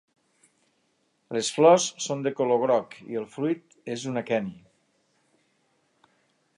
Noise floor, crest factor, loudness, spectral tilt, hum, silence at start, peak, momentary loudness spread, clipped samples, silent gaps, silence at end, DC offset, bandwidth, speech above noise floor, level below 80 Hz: -71 dBFS; 22 dB; -25 LUFS; -4 dB/octave; none; 1.3 s; -6 dBFS; 16 LU; under 0.1%; none; 2 s; under 0.1%; 11.5 kHz; 46 dB; -76 dBFS